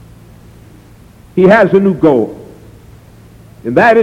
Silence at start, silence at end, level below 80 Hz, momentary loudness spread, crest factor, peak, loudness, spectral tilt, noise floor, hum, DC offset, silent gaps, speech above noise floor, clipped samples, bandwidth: 1.35 s; 0 s; -44 dBFS; 16 LU; 12 dB; 0 dBFS; -10 LUFS; -8 dB/octave; -39 dBFS; none; under 0.1%; none; 31 dB; under 0.1%; 11.5 kHz